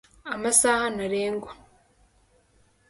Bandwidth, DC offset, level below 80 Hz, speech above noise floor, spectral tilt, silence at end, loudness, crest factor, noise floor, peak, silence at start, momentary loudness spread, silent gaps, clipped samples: 12 kHz; under 0.1%; -58 dBFS; 38 dB; -2 dB/octave; 1.35 s; -24 LUFS; 24 dB; -63 dBFS; -4 dBFS; 0.25 s; 16 LU; none; under 0.1%